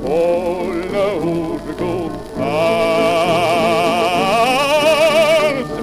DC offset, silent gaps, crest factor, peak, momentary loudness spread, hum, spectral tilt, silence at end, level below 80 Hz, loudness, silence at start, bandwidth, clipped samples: under 0.1%; none; 14 dB; -2 dBFS; 10 LU; none; -4.5 dB/octave; 0 s; -42 dBFS; -16 LUFS; 0 s; 16 kHz; under 0.1%